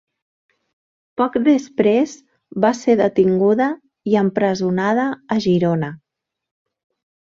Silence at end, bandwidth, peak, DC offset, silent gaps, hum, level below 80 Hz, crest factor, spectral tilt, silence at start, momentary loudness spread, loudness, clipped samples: 1.25 s; 7.6 kHz; -2 dBFS; under 0.1%; none; none; -60 dBFS; 18 dB; -7 dB/octave; 1.2 s; 8 LU; -18 LUFS; under 0.1%